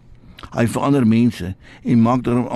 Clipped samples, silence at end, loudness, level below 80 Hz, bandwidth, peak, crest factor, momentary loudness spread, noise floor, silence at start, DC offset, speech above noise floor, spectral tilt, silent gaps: under 0.1%; 0 s; -17 LUFS; -46 dBFS; 13 kHz; -6 dBFS; 12 dB; 14 LU; -40 dBFS; 0.45 s; under 0.1%; 23 dB; -7.5 dB/octave; none